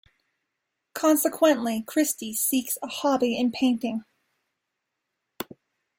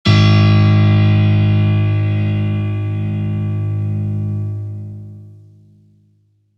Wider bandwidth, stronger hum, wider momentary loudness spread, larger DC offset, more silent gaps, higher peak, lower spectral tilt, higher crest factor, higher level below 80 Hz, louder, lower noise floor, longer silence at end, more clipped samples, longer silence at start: first, 16.5 kHz vs 6.4 kHz; neither; about the same, 17 LU vs 15 LU; neither; neither; second, -8 dBFS vs -2 dBFS; second, -3 dB/octave vs -8 dB/octave; about the same, 18 dB vs 14 dB; second, -72 dBFS vs -42 dBFS; second, -24 LUFS vs -15 LUFS; first, -82 dBFS vs -57 dBFS; second, 0.55 s vs 1.25 s; neither; first, 0.95 s vs 0.05 s